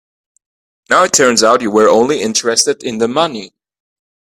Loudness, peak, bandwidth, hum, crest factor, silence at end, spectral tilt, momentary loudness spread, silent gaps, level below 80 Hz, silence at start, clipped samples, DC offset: -12 LUFS; 0 dBFS; 16 kHz; none; 14 dB; 0.85 s; -2 dB/octave; 7 LU; none; -56 dBFS; 0.9 s; under 0.1%; under 0.1%